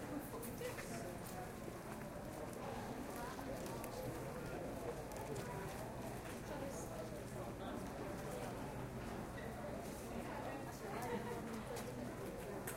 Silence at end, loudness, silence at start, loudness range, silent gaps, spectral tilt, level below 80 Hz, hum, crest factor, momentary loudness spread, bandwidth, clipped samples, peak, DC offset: 0 s; -47 LUFS; 0 s; 1 LU; none; -5.5 dB/octave; -60 dBFS; none; 20 dB; 2 LU; 16 kHz; under 0.1%; -26 dBFS; under 0.1%